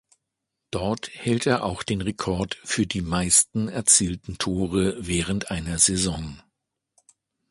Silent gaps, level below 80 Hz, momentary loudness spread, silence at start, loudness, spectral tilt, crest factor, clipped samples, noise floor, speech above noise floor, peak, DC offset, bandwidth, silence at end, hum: none; -44 dBFS; 11 LU; 0.75 s; -23 LUFS; -3.5 dB/octave; 22 dB; under 0.1%; -82 dBFS; 58 dB; -4 dBFS; under 0.1%; 12 kHz; 1.1 s; none